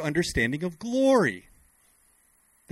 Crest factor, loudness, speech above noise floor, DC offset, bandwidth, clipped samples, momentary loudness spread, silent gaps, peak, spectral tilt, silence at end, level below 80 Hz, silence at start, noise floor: 18 dB; -25 LUFS; 39 dB; under 0.1%; 14.5 kHz; under 0.1%; 10 LU; none; -10 dBFS; -5 dB/octave; 1.35 s; -48 dBFS; 0 s; -64 dBFS